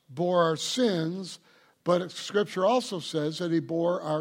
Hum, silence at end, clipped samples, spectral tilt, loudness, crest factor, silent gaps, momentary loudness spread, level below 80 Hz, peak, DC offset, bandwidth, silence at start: none; 0 s; under 0.1%; -5 dB/octave; -28 LUFS; 16 dB; none; 9 LU; -78 dBFS; -12 dBFS; under 0.1%; 16 kHz; 0.1 s